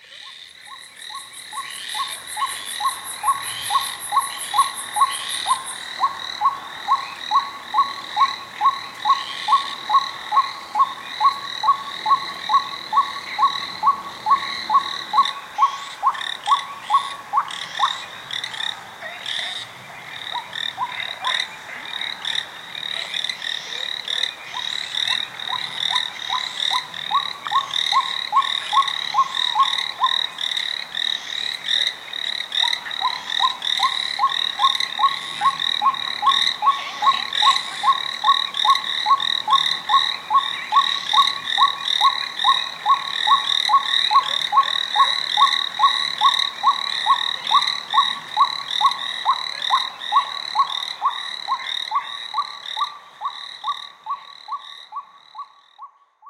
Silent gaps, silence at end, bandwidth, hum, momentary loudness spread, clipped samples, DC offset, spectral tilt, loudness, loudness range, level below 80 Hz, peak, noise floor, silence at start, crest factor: none; 0 s; 16 kHz; none; 11 LU; under 0.1%; under 0.1%; 1 dB/octave; -20 LUFS; 8 LU; -68 dBFS; -2 dBFS; -44 dBFS; 0.05 s; 20 dB